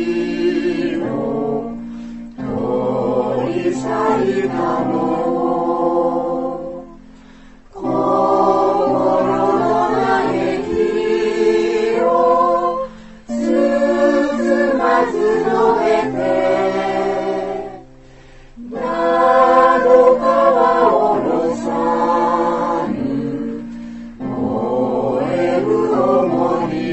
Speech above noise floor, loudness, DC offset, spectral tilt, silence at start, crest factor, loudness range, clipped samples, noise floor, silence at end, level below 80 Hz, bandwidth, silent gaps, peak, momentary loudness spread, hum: 24 dB; -16 LUFS; under 0.1%; -6.5 dB/octave; 0 s; 16 dB; 7 LU; under 0.1%; -41 dBFS; 0 s; -46 dBFS; 8.4 kHz; none; -2 dBFS; 12 LU; none